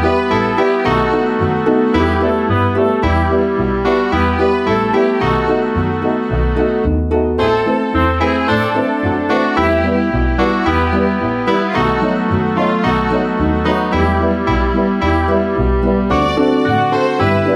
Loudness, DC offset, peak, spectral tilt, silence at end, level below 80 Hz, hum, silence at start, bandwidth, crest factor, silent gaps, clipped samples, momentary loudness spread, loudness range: -15 LUFS; under 0.1%; -2 dBFS; -7.5 dB/octave; 0 s; -26 dBFS; none; 0 s; 11.5 kHz; 12 dB; none; under 0.1%; 2 LU; 1 LU